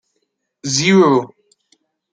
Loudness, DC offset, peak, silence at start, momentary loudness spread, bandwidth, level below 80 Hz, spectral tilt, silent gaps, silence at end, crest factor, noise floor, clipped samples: -14 LUFS; under 0.1%; -2 dBFS; 0.65 s; 18 LU; 9.4 kHz; -62 dBFS; -4.5 dB/octave; none; 0.85 s; 16 dB; -71 dBFS; under 0.1%